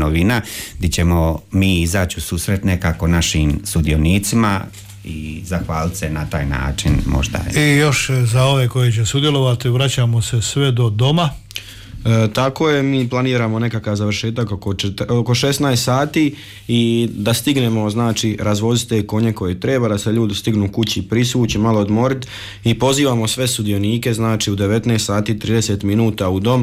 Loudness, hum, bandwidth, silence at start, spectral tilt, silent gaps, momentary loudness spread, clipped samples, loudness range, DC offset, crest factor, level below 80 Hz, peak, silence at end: -17 LUFS; none; 16 kHz; 0 s; -5.5 dB/octave; none; 6 LU; under 0.1%; 3 LU; under 0.1%; 12 dB; -32 dBFS; -6 dBFS; 0 s